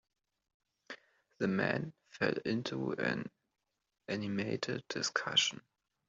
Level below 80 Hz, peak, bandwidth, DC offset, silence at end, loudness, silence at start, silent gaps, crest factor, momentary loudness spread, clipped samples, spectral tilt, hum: -76 dBFS; -14 dBFS; 8 kHz; under 0.1%; 0.5 s; -35 LUFS; 0.9 s; none; 24 dB; 21 LU; under 0.1%; -3 dB/octave; none